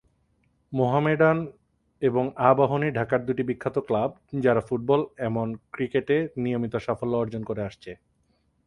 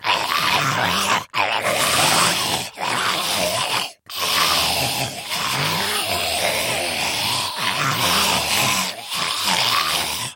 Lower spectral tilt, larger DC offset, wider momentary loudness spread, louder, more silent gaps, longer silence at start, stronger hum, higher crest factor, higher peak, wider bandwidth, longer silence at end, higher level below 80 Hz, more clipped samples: first, -8.5 dB/octave vs -1.5 dB/octave; neither; first, 11 LU vs 6 LU; second, -25 LUFS vs -19 LUFS; neither; first, 0.7 s vs 0 s; neither; about the same, 22 dB vs 18 dB; about the same, -4 dBFS vs -4 dBFS; second, 11 kHz vs 17 kHz; first, 0.7 s vs 0 s; second, -58 dBFS vs -52 dBFS; neither